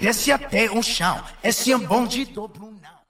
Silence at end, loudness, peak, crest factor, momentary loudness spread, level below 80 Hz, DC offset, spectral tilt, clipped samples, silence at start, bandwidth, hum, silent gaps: 0.2 s; -21 LUFS; -6 dBFS; 16 dB; 10 LU; -44 dBFS; under 0.1%; -3 dB/octave; under 0.1%; 0 s; 16.5 kHz; none; none